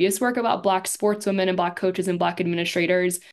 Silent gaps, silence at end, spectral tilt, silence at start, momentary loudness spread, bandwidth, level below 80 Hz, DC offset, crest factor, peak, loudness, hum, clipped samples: none; 0.15 s; -4.5 dB/octave; 0 s; 3 LU; 12.5 kHz; -70 dBFS; under 0.1%; 16 dB; -8 dBFS; -23 LUFS; none; under 0.1%